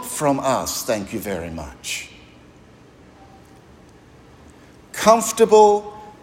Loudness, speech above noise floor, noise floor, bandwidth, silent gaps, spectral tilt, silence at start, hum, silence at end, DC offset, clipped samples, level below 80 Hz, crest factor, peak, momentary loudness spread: -19 LUFS; 30 dB; -48 dBFS; 16.5 kHz; none; -3.5 dB/octave; 0 s; none; 0.15 s; under 0.1%; under 0.1%; -52 dBFS; 20 dB; 0 dBFS; 19 LU